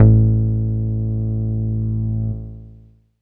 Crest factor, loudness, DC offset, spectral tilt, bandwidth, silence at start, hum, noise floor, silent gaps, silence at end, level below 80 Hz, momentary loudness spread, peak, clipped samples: 18 dB; -20 LUFS; under 0.1%; -15 dB/octave; 1.4 kHz; 0 s; 50 Hz at -75 dBFS; -47 dBFS; none; 0.55 s; -28 dBFS; 13 LU; 0 dBFS; under 0.1%